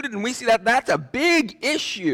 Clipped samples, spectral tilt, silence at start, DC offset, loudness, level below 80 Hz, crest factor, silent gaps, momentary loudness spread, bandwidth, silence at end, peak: under 0.1%; -3 dB/octave; 0 s; under 0.1%; -20 LUFS; -58 dBFS; 12 dB; none; 6 LU; 17.5 kHz; 0 s; -10 dBFS